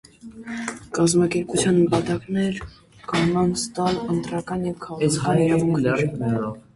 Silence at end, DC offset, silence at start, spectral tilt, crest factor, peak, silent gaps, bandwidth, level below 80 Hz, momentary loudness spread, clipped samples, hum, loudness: 0.15 s; under 0.1%; 0.25 s; -5.5 dB/octave; 16 dB; -8 dBFS; none; 11.5 kHz; -50 dBFS; 12 LU; under 0.1%; none; -22 LUFS